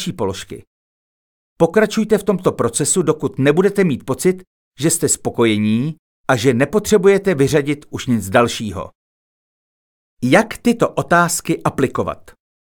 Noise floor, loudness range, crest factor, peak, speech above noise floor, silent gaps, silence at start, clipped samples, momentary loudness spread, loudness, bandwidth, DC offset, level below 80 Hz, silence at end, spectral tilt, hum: under -90 dBFS; 3 LU; 16 dB; 0 dBFS; over 74 dB; 0.67-1.56 s, 4.47-4.72 s, 5.99-6.24 s, 8.95-10.17 s; 0 s; under 0.1%; 11 LU; -17 LUFS; 19.5 kHz; under 0.1%; -50 dBFS; 0.45 s; -5 dB/octave; none